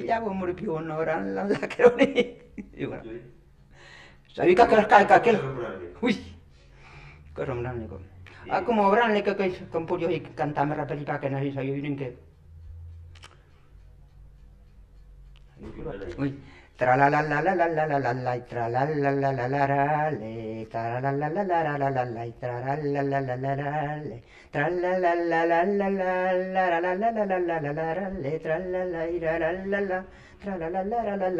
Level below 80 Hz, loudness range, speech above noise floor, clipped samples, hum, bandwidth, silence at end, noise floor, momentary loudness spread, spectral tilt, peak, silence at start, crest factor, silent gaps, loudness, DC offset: -54 dBFS; 10 LU; 27 dB; under 0.1%; none; 10 kHz; 0 s; -53 dBFS; 16 LU; -7.5 dB/octave; -2 dBFS; 0 s; 24 dB; none; -26 LUFS; under 0.1%